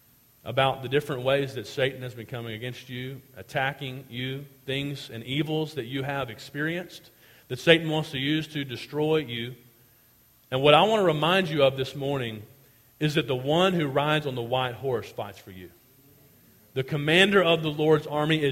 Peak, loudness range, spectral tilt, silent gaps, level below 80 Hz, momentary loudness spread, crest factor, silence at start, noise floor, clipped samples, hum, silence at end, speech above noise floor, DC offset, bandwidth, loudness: -2 dBFS; 8 LU; -5.5 dB/octave; none; -62 dBFS; 16 LU; 24 dB; 0.45 s; -60 dBFS; under 0.1%; none; 0 s; 34 dB; under 0.1%; 16.5 kHz; -26 LUFS